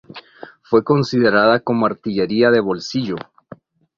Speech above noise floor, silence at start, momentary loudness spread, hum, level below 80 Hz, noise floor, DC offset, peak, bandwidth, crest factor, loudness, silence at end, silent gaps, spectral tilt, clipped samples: 27 dB; 0.15 s; 13 LU; none; -56 dBFS; -43 dBFS; under 0.1%; -2 dBFS; 7.4 kHz; 16 dB; -17 LUFS; 0.75 s; none; -6.5 dB/octave; under 0.1%